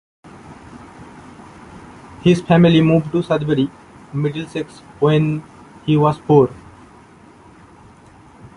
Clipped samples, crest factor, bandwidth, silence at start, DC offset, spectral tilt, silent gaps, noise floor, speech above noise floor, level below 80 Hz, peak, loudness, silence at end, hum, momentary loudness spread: under 0.1%; 16 dB; 11 kHz; 0.5 s; under 0.1%; -8 dB/octave; none; -45 dBFS; 29 dB; -50 dBFS; -2 dBFS; -17 LUFS; 2.05 s; none; 27 LU